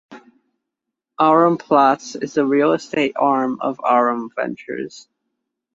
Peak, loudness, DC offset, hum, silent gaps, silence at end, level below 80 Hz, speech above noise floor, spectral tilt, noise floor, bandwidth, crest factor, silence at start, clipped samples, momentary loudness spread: -2 dBFS; -18 LUFS; under 0.1%; none; none; 0.75 s; -68 dBFS; 64 dB; -5.5 dB/octave; -82 dBFS; 7.8 kHz; 18 dB; 0.1 s; under 0.1%; 11 LU